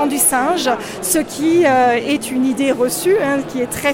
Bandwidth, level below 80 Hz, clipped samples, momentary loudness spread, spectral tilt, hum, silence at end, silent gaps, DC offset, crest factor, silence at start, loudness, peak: 17 kHz; -50 dBFS; under 0.1%; 6 LU; -3 dB/octave; none; 0 s; none; under 0.1%; 14 dB; 0 s; -16 LUFS; -2 dBFS